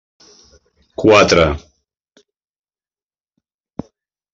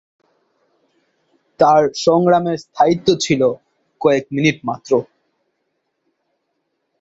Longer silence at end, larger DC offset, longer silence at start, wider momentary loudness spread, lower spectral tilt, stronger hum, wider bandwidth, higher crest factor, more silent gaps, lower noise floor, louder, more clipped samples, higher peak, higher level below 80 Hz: first, 2.75 s vs 2 s; neither; second, 1 s vs 1.6 s; first, 24 LU vs 7 LU; about the same, -4.5 dB/octave vs -5.5 dB/octave; neither; about the same, 7.8 kHz vs 8 kHz; about the same, 20 dB vs 18 dB; neither; first, under -90 dBFS vs -71 dBFS; first, -12 LUFS vs -16 LUFS; neither; about the same, 0 dBFS vs -2 dBFS; first, -40 dBFS vs -58 dBFS